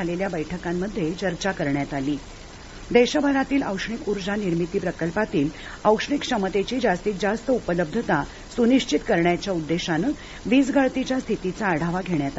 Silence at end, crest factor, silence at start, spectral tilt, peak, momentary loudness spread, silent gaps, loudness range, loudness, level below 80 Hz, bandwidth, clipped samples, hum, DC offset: 0 s; 20 dB; 0 s; -5.5 dB/octave; -4 dBFS; 8 LU; none; 2 LU; -24 LUFS; -44 dBFS; 8 kHz; under 0.1%; none; under 0.1%